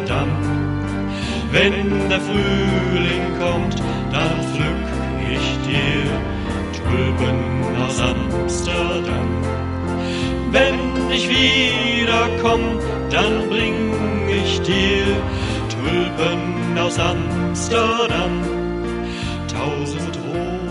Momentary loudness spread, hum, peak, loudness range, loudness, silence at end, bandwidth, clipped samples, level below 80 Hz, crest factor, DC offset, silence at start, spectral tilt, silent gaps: 7 LU; none; -4 dBFS; 4 LU; -19 LUFS; 0 s; 11.5 kHz; under 0.1%; -30 dBFS; 16 dB; under 0.1%; 0 s; -5 dB/octave; none